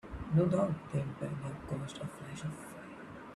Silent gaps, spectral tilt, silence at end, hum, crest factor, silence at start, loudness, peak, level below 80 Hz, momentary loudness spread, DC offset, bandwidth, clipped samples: none; -7.5 dB/octave; 0 s; none; 18 dB; 0.05 s; -36 LUFS; -18 dBFS; -56 dBFS; 17 LU; under 0.1%; 12.5 kHz; under 0.1%